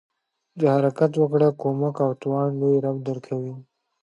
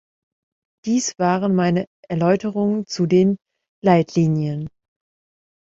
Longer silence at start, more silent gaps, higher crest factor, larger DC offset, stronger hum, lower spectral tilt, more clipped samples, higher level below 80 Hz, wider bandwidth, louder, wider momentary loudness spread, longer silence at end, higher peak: second, 0.55 s vs 0.85 s; second, none vs 1.87-2.03 s, 3.68-3.82 s; about the same, 18 dB vs 18 dB; neither; neither; first, -9.5 dB/octave vs -6.5 dB/octave; neither; second, -74 dBFS vs -58 dBFS; first, 10.5 kHz vs 7.8 kHz; second, -23 LUFS vs -20 LUFS; about the same, 10 LU vs 11 LU; second, 0.4 s vs 0.9 s; second, -6 dBFS vs -2 dBFS